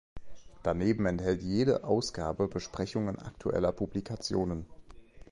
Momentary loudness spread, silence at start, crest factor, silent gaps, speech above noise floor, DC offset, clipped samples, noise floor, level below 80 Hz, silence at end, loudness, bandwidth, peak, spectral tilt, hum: 8 LU; 0.15 s; 18 dB; none; 20 dB; under 0.1%; under 0.1%; -51 dBFS; -50 dBFS; 0.1 s; -32 LUFS; 11.5 kHz; -14 dBFS; -6.5 dB/octave; none